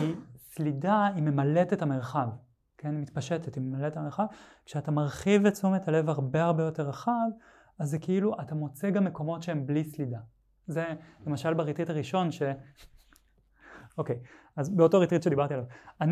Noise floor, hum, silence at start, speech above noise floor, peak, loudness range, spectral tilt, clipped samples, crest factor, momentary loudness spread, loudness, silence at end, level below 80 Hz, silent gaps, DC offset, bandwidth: -64 dBFS; none; 0 s; 35 dB; -10 dBFS; 5 LU; -7.5 dB/octave; under 0.1%; 20 dB; 12 LU; -29 LUFS; 0 s; -64 dBFS; none; under 0.1%; 14.5 kHz